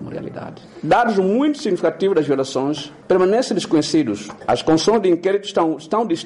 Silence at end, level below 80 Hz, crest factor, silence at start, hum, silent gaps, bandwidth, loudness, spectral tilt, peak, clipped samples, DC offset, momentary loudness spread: 0 s; -54 dBFS; 12 dB; 0 s; none; none; 11.5 kHz; -18 LUFS; -5.5 dB/octave; -6 dBFS; under 0.1%; under 0.1%; 13 LU